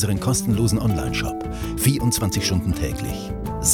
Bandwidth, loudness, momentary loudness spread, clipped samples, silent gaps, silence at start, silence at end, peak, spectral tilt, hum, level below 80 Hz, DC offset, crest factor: 19.5 kHz; -22 LUFS; 9 LU; under 0.1%; none; 0 s; 0 s; -4 dBFS; -4.5 dB/octave; none; -34 dBFS; under 0.1%; 18 dB